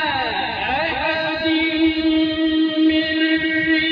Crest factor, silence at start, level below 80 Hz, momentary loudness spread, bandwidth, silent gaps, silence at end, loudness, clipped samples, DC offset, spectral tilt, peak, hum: 12 dB; 0 s; -46 dBFS; 4 LU; 5.2 kHz; none; 0 s; -18 LUFS; under 0.1%; under 0.1%; -6.5 dB/octave; -6 dBFS; none